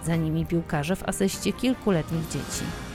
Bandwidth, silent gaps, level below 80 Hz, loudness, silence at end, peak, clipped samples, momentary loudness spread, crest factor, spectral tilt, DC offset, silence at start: 16 kHz; none; -44 dBFS; -27 LUFS; 0 s; -10 dBFS; under 0.1%; 5 LU; 16 dB; -5.5 dB/octave; under 0.1%; 0 s